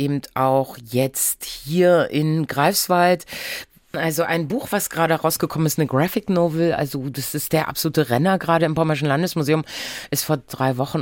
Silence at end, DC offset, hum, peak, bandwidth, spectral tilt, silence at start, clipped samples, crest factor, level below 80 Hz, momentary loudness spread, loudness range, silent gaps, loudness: 0 s; under 0.1%; none; -4 dBFS; 17 kHz; -5 dB/octave; 0 s; under 0.1%; 16 dB; -56 dBFS; 8 LU; 2 LU; none; -20 LUFS